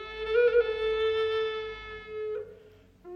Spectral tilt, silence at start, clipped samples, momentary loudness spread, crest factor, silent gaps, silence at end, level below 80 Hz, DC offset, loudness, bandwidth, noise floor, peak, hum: -4.5 dB/octave; 0 s; under 0.1%; 16 LU; 16 dB; none; 0 s; -54 dBFS; under 0.1%; -28 LUFS; 6 kHz; -55 dBFS; -14 dBFS; none